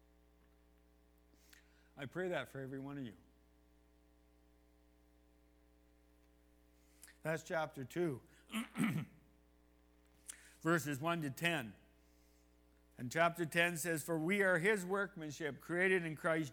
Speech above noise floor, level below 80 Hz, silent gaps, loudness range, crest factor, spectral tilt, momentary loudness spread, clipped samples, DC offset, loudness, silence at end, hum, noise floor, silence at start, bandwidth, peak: 31 dB; -72 dBFS; none; 12 LU; 24 dB; -5 dB/octave; 16 LU; under 0.1%; under 0.1%; -38 LUFS; 0 s; 60 Hz at -70 dBFS; -69 dBFS; 1.95 s; 20 kHz; -18 dBFS